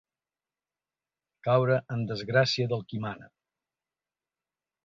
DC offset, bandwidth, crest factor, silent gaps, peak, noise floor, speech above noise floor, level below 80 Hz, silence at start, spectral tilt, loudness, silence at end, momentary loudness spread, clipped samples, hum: under 0.1%; 7.6 kHz; 22 dB; none; -10 dBFS; under -90 dBFS; over 63 dB; -68 dBFS; 1.45 s; -6 dB/octave; -28 LUFS; 1.6 s; 12 LU; under 0.1%; none